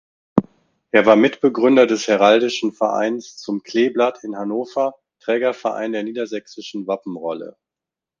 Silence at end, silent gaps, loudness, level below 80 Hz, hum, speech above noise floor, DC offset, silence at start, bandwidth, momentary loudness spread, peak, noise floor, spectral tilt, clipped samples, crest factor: 0.7 s; none; -19 LUFS; -60 dBFS; none; 69 dB; under 0.1%; 0.35 s; 7.6 kHz; 14 LU; 0 dBFS; -87 dBFS; -5 dB/octave; under 0.1%; 18 dB